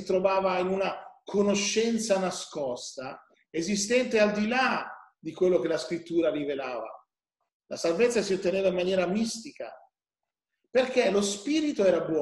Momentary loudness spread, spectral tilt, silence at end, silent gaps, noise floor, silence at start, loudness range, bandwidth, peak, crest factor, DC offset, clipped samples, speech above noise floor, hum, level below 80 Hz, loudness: 14 LU; -4 dB/octave; 0 s; 7.54-7.60 s; under -90 dBFS; 0 s; 2 LU; 12.5 kHz; -10 dBFS; 18 dB; under 0.1%; under 0.1%; over 63 dB; none; -66 dBFS; -27 LUFS